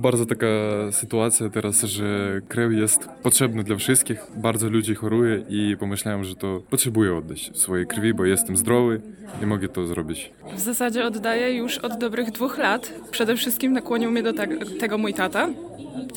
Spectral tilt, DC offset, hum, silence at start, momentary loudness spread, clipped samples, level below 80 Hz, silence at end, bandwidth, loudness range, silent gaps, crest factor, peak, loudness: -4 dB/octave; under 0.1%; none; 0 s; 9 LU; under 0.1%; -58 dBFS; 0 s; 18 kHz; 4 LU; none; 18 dB; -6 dBFS; -22 LUFS